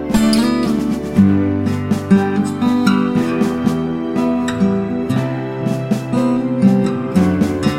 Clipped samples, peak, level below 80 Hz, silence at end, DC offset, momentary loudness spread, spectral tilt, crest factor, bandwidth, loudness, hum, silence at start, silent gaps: under 0.1%; 0 dBFS; -40 dBFS; 0 s; under 0.1%; 6 LU; -7 dB/octave; 14 dB; 15.5 kHz; -16 LUFS; none; 0 s; none